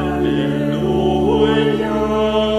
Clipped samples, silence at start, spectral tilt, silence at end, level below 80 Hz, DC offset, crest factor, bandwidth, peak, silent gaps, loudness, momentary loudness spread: under 0.1%; 0 s; -7 dB/octave; 0 s; -34 dBFS; under 0.1%; 14 dB; 14.5 kHz; -2 dBFS; none; -17 LUFS; 4 LU